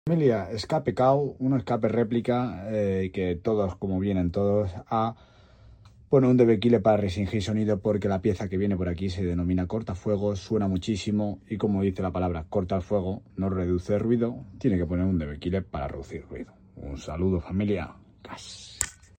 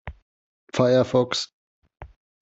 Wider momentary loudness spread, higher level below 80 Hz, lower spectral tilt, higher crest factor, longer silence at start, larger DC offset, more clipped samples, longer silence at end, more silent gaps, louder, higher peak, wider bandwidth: second, 11 LU vs 16 LU; about the same, -48 dBFS vs -50 dBFS; first, -7 dB/octave vs -5.5 dB/octave; about the same, 22 dB vs 20 dB; about the same, 0.05 s vs 0.05 s; neither; neither; about the same, 0.25 s vs 0.35 s; second, none vs 0.22-0.67 s, 1.53-1.82 s; second, -27 LUFS vs -22 LUFS; about the same, -4 dBFS vs -6 dBFS; first, 16 kHz vs 8 kHz